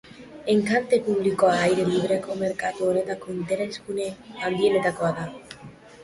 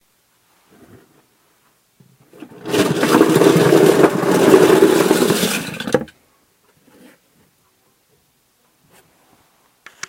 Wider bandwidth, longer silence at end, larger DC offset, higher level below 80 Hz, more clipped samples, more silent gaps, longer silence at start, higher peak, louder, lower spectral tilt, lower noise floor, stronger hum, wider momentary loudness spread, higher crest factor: second, 11.5 kHz vs 17 kHz; second, 0 s vs 4.05 s; neither; about the same, -60 dBFS vs -58 dBFS; neither; neither; second, 0.1 s vs 2.65 s; second, -8 dBFS vs 0 dBFS; second, -24 LUFS vs -14 LUFS; about the same, -5.5 dB/octave vs -5 dB/octave; second, -45 dBFS vs -60 dBFS; neither; about the same, 13 LU vs 11 LU; about the same, 16 dB vs 18 dB